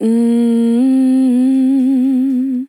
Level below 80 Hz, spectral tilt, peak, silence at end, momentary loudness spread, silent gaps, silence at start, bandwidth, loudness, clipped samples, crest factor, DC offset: under -90 dBFS; -7 dB/octave; -6 dBFS; 0.05 s; 2 LU; none; 0 s; 11 kHz; -13 LUFS; under 0.1%; 6 dB; under 0.1%